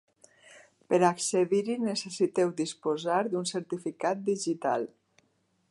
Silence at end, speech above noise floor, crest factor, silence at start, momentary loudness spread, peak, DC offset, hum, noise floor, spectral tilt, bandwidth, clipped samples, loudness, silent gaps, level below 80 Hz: 0.85 s; 44 dB; 20 dB; 0.5 s; 8 LU; -10 dBFS; under 0.1%; none; -72 dBFS; -4.5 dB/octave; 11.5 kHz; under 0.1%; -29 LUFS; none; -82 dBFS